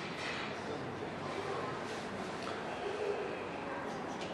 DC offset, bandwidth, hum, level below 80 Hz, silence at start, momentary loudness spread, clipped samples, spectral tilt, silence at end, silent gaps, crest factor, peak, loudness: under 0.1%; 12.5 kHz; none; -68 dBFS; 0 s; 3 LU; under 0.1%; -4.5 dB/octave; 0 s; none; 14 dB; -24 dBFS; -40 LUFS